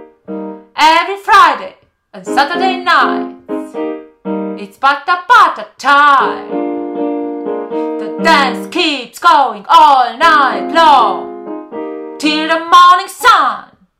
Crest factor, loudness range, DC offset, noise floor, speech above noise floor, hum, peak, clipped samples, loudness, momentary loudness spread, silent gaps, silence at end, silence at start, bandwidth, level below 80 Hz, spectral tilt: 12 dB; 5 LU; under 0.1%; -34 dBFS; 24 dB; none; 0 dBFS; 2%; -10 LUFS; 17 LU; none; 0.4 s; 0 s; 20 kHz; -54 dBFS; -3 dB/octave